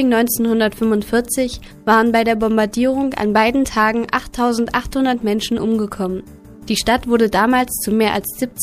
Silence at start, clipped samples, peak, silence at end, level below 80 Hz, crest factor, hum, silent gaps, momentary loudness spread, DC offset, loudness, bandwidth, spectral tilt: 0 s; under 0.1%; 0 dBFS; 0 s; -40 dBFS; 16 dB; none; none; 7 LU; under 0.1%; -17 LUFS; 15.5 kHz; -4 dB/octave